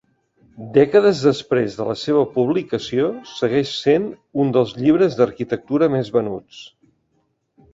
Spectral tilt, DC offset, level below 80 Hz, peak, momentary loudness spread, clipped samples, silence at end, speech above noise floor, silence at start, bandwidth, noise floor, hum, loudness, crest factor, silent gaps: -6.5 dB/octave; under 0.1%; -58 dBFS; -2 dBFS; 11 LU; under 0.1%; 1.05 s; 49 dB; 0.6 s; 7.8 kHz; -67 dBFS; none; -19 LUFS; 16 dB; none